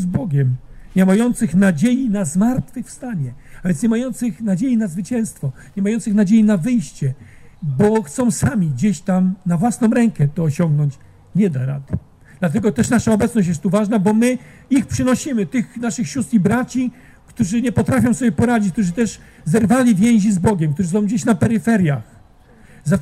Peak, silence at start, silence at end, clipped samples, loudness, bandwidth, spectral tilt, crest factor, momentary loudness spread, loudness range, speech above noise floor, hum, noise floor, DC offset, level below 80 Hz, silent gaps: -2 dBFS; 0 s; 0 s; under 0.1%; -18 LUFS; 13.5 kHz; -7 dB/octave; 16 dB; 10 LU; 3 LU; 30 dB; none; -46 dBFS; under 0.1%; -44 dBFS; none